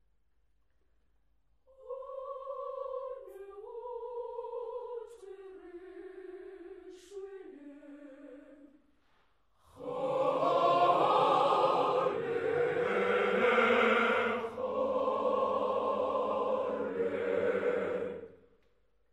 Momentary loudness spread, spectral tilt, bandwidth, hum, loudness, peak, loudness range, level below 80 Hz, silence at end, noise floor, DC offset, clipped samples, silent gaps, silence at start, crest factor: 23 LU; -5.5 dB/octave; 10 kHz; none; -31 LUFS; -14 dBFS; 20 LU; -74 dBFS; 0.75 s; -76 dBFS; under 0.1%; under 0.1%; none; 1.8 s; 20 dB